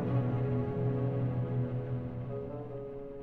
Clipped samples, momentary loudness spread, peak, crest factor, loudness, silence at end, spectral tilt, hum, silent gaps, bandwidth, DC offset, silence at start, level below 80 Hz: under 0.1%; 10 LU; -20 dBFS; 14 dB; -35 LUFS; 0 s; -11.5 dB/octave; none; none; 3.9 kHz; under 0.1%; 0 s; -52 dBFS